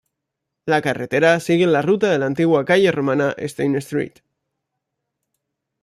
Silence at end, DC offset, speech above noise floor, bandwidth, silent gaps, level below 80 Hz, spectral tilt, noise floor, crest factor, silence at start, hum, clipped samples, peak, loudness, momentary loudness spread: 1.75 s; under 0.1%; 63 dB; 14.5 kHz; none; -62 dBFS; -6 dB/octave; -80 dBFS; 18 dB; 0.65 s; none; under 0.1%; -2 dBFS; -18 LUFS; 8 LU